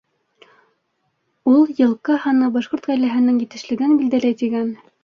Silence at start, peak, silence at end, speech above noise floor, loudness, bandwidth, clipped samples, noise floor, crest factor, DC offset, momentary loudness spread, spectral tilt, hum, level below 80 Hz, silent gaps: 1.45 s; -4 dBFS; 0.3 s; 53 dB; -18 LUFS; 7 kHz; under 0.1%; -70 dBFS; 14 dB; under 0.1%; 8 LU; -6 dB/octave; none; -66 dBFS; none